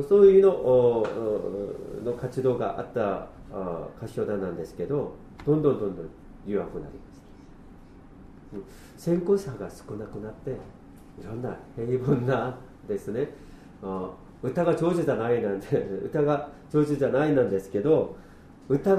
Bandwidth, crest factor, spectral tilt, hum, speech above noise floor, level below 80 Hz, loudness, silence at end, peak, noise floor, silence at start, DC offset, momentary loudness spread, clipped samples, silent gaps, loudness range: 12.5 kHz; 20 dB; -8.5 dB/octave; none; 22 dB; -52 dBFS; -26 LUFS; 0 s; -6 dBFS; -48 dBFS; 0 s; under 0.1%; 17 LU; under 0.1%; none; 7 LU